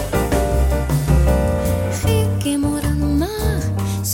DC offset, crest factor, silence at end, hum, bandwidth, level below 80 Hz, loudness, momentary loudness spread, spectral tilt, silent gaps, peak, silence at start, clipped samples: under 0.1%; 14 dB; 0 s; none; 17 kHz; -22 dBFS; -19 LUFS; 4 LU; -6 dB/octave; none; -2 dBFS; 0 s; under 0.1%